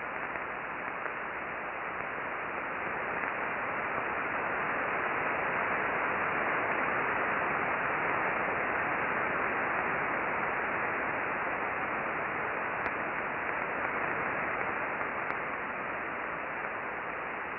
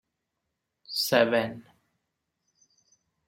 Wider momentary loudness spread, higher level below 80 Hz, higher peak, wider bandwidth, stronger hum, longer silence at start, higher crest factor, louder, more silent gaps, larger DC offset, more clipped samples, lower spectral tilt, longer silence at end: second, 6 LU vs 14 LU; first, -62 dBFS vs -72 dBFS; second, -14 dBFS vs -6 dBFS; second, 5.6 kHz vs 16 kHz; neither; second, 0 s vs 0.9 s; second, 18 dB vs 26 dB; second, -32 LUFS vs -26 LUFS; neither; neither; neither; first, -8.5 dB/octave vs -3.5 dB/octave; second, 0 s vs 1.65 s